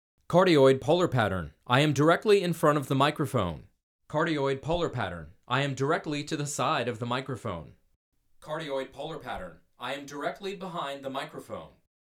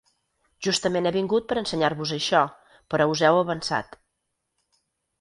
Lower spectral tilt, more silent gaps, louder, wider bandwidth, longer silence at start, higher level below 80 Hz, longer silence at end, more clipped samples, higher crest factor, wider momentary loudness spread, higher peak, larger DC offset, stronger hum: first, -5.5 dB/octave vs -4 dB/octave; first, 3.83-3.99 s, 7.96-8.12 s vs none; second, -28 LUFS vs -24 LUFS; first, 17 kHz vs 11.5 kHz; second, 0.3 s vs 0.6 s; about the same, -56 dBFS vs -60 dBFS; second, 0.5 s vs 1.35 s; neither; about the same, 22 dB vs 20 dB; first, 16 LU vs 9 LU; second, -8 dBFS vs -4 dBFS; neither; neither